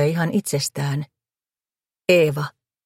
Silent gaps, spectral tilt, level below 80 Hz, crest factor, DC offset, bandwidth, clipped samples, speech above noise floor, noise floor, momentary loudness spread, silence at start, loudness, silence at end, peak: none; -5 dB/octave; -64 dBFS; 18 dB; under 0.1%; 16.5 kHz; under 0.1%; over 70 dB; under -90 dBFS; 13 LU; 0 s; -21 LUFS; 0.35 s; -4 dBFS